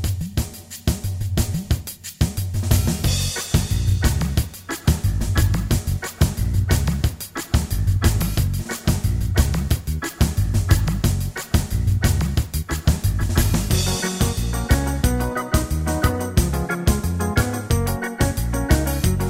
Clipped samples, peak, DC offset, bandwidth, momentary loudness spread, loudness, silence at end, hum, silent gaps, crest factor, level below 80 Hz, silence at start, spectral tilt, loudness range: under 0.1%; -2 dBFS; under 0.1%; 16.5 kHz; 5 LU; -22 LUFS; 0 s; none; none; 18 dB; -24 dBFS; 0 s; -5 dB/octave; 1 LU